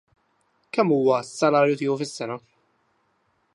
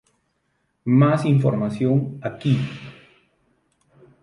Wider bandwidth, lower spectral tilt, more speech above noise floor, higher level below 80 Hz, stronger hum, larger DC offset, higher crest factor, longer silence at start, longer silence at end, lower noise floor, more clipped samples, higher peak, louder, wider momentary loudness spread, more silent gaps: about the same, 11.5 kHz vs 10.5 kHz; second, -5.5 dB/octave vs -9 dB/octave; second, 47 dB vs 51 dB; second, -74 dBFS vs -60 dBFS; neither; neither; about the same, 20 dB vs 16 dB; about the same, 0.75 s vs 0.85 s; second, 1.15 s vs 1.3 s; about the same, -69 dBFS vs -70 dBFS; neither; about the same, -6 dBFS vs -6 dBFS; about the same, -23 LUFS vs -21 LUFS; about the same, 13 LU vs 15 LU; neither